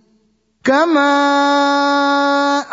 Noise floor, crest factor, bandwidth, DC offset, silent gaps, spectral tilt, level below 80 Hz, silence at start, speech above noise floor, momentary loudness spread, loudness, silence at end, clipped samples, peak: -59 dBFS; 14 dB; 7.8 kHz; under 0.1%; none; -2.5 dB/octave; -66 dBFS; 0.65 s; 46 dB; 3 LU; -14 LUFS; 0 s; under 0.1%; -2 dBFS